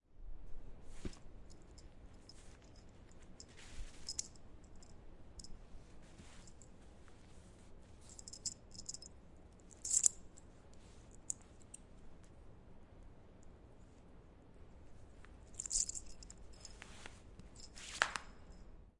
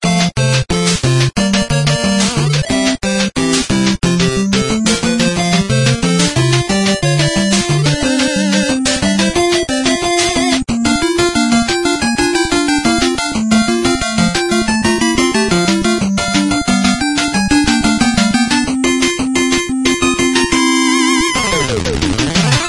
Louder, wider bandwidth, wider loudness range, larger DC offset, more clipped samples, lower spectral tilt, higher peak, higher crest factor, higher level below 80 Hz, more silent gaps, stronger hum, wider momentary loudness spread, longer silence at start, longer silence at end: second, -41 LUFS vs -13 LUFS; about the same, 11.5 kHz vs 11.5 kHz; first, 19 LU vs 1 LU; neither; neither; second, -1 dB/octave vs -4 dB/octave; second, -10 dBFS vs 0 dBFS; first, 38 dB vs 14 dB; second, -58 dBFS vs -32 dBFS; neither; neither; first, 24 LU vs 2 LU; about the same, 0.1 s vs 0 s; about the same, 0.05 s vs 0 s